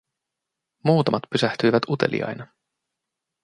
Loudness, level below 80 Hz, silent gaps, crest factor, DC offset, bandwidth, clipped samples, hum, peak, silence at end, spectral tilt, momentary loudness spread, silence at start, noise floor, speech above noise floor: -22 LUFS; -64 dBFS; none; 22 dB; under 0.1%; 11 kHz; under 0.1%; none; -4 dBFS; 1 s; -6.5 dB/octave; 9 LU; 0.85 s; -84 dBFS; 62 dB